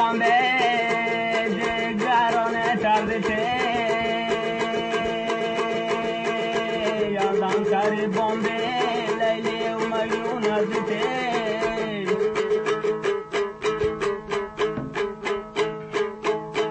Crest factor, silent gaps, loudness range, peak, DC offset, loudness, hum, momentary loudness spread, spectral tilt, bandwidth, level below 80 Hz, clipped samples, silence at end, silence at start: 14 dB; none; 3 LU; -10 dBFS; under 0.1%; -24 LUFS; none; 6 LU; -4.5 dB/octave; 8.8 kHz; -54 dBFS; under 0.1%; 0 s; 0 s